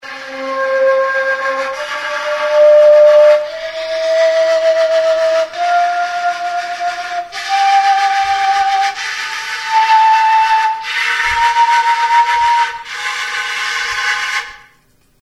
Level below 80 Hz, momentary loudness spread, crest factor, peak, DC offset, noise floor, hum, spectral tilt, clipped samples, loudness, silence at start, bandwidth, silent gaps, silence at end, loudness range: -52 dBFS; 11 LU; 12 dB; 0 dBFS; under 0.1%; -53 dBFS; none; 0 dB/octave; under 0.1%; -13 LUFS; 0.05 s; 12.5 kHz; none; 0.65 s; 4 LU